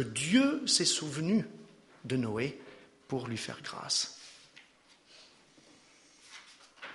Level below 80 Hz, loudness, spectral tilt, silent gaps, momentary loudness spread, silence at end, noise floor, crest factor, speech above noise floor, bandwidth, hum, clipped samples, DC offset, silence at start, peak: -72 dBFS; -31 LUFS; -3.5 dB/octave; none; 24 LU; 0 s; -63 dBFS; 22 dB; 31 dB; 11.5 kHz; none; under 0.1%; under 0.1%; 0 s; -12 dBFS